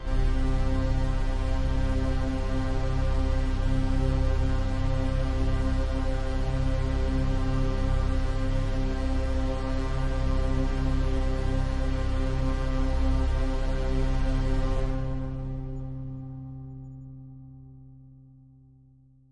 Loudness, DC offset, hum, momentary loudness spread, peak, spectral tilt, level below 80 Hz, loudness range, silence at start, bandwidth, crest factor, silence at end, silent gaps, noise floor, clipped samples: -29 LUFS; under 0.1%; none; 9 LU; -12 dBFS; -7.5 dB/octave; -28 dBFS; 7 LU; 0 s; 8.6 kHz; 14 dB; 1.4 s; none; -57 dBFS; under 0.1%